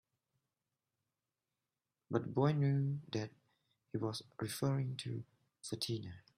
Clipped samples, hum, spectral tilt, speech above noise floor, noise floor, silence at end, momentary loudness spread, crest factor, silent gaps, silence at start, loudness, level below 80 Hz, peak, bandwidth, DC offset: under 0.1%; none; -6.5 dB/octave; over 52 dB; under -90 dBFS; 0.2 s; 13 LU; 20 dB; none; 2.1 s; -39 LUFS; -76 dBFS; -20 dBFS; 15 kHz; under 0.1%